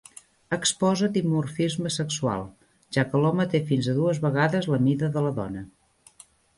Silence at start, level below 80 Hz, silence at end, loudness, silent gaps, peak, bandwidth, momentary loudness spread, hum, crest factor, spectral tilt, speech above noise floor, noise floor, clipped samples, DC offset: 0.5 s; -58 dBFS; 0.9 s; -25 LUFS; none; -8 dBFS; 11.5 kHz; 9 LU; none; 18 dB; -5.5 dB/octave; 31 dB; -55 dBFS; under 0.1%; under 0.1%